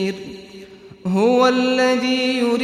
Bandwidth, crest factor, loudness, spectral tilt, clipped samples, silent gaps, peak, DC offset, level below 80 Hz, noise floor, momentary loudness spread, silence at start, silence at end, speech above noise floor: 13 kHz; 16 dB; -17 LUFS; -5 dB/octave; under 0.1%; none; -4 dBFS; under 0.1%; -60 dBFS; -40 dBFS; 18 LU; 0 s; 0 s; 23 dB